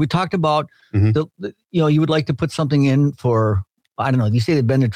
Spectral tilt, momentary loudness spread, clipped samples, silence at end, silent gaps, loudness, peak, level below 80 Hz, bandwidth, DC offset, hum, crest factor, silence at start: -7.5 dB/octave; 8 LU; under 0.1%; 0 s; none; -18 LUFS; -6 dBFS; -54 dBFS; 10.5 kHz; under 0.1%; none; 10 dB; 0 s